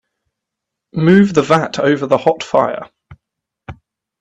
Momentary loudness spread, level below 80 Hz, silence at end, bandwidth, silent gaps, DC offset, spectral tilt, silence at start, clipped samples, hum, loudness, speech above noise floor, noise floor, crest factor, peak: 9 LU; -52 dBFS; 0.5 s; 8.4 kHz; none; under 0.1%; -6.5 dB/octave; 0.95 s; under 0.1%; none; -14 LUFS; 67 dB; -80 dBFS; 16 dB; 0 dBFS